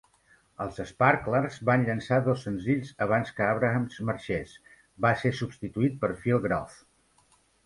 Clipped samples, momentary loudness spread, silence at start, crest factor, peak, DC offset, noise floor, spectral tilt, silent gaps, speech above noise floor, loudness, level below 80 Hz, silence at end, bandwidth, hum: under 0.1%; 9 LU; 0.6 s; 20 dB; -8 dBFS; under 0.1%; -65 dBFS; -7.5 dB/octave; none; 38 dB; -28 LUFS; -56 dBFS; 0.9 s; 11.5 kHz; none